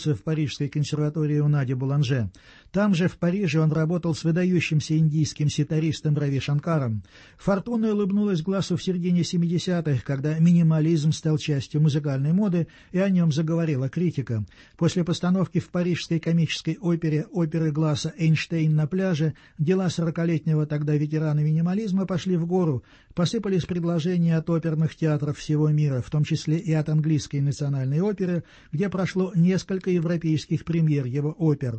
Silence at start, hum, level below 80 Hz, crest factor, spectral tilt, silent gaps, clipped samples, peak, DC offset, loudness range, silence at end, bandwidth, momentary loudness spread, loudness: 0 s; none; -56 dBFS; 14 dB; -7 dB/octave; none; under 0.1%; -8 dBFS; under 0.1%; 2 LU; 0 s; 8.6 kHz; 5 LU; -24 LUFS